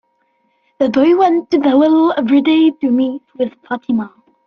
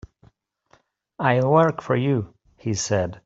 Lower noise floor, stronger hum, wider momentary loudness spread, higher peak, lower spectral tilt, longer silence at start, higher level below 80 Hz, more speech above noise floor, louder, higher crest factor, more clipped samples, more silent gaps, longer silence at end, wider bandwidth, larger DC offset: about the same, -62 dBFS vs -61 dBFS; neither; about the same, 11 LU vs 11 LU; about the same, -2 dBFS vs -4 dBFS; about the same, -7 dB/octave vs -6 dB/octave; second, 0.8 s vs 1.2 s; about the same, -60 dBFS vs -56 dBFS; first, 49 dB vs 41 dB; first, -14 LUFS vs -22 LUFS; second, 12 dB vs 20 dB; neither; neither; first, 0.4 s vs 0.1 s; second, 6.4 kHz vs 8 kHz; neither